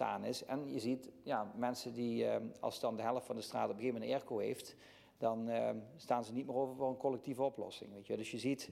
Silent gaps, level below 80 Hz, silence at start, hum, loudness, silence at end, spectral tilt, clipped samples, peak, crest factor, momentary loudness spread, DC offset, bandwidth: none; -80 dBFS; 0 s; none; -40 LUFS; 0 s; -5.5 dB/octave; under 0.1%; -22 dBFS; 18 dB; 6 LU; under 0.1%; 16 kHz